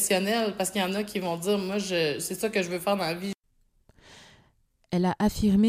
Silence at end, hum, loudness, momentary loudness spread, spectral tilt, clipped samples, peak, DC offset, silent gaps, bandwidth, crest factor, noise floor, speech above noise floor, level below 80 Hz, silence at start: 0 s; none; -27 LUFS; 6 LU; -4.5 dB/octave; under 0.1%; -10 dBFS; under 0.1%; none; 16 kHz; 16 dB; -67 dBFS; 41 dB; -50 dBFS; 0 s